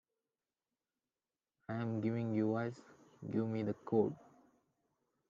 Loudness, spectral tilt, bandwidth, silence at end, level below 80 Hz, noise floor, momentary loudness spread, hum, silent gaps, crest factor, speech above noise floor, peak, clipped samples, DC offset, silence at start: -38 LUFS; -9.5 dB/octave; 7.4 kHz; 1.15 s; -82 dBFS; under -90 dBFS; 18 LU; none; none; 20 dB; over 53 dB; -20 dBFS; under 0.1%; under 0.1%; 1.7 s